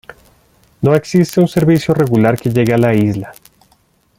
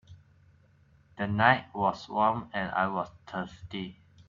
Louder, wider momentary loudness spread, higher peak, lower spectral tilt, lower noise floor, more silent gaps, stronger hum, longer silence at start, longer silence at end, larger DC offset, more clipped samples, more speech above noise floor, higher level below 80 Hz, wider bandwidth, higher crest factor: first, -13 LUFS vs -29 LUFS; second, 6 LU vs 15 LU; first, -2 dBFS vs -10 dBFS; about the same, -7.5 dB/octave vs -6.5 dB/octave; second, -55 dBFS vs -62 dBFS; neither; neither; about the same, 0.1 s vs 0.1 s; first, 0.85 s vs 0.35 s; neither; neither; first, 43 dB vs 33 dB; first, -46 dBFS vs -62 dBFS; first, 17 kHz vs 7.4 kHz; second, 12 dB vs 22 dB